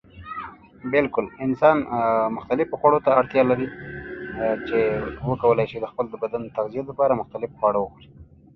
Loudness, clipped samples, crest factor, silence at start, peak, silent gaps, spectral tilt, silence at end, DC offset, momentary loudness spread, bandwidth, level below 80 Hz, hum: -23 LUFS; under 0.1%; 20 dB; 0.15 s; -4 dBFS; none; -9 dB/octave; 0.3 s; under 0.1%; 16 LU; 6 kHz; -52 dBFS; none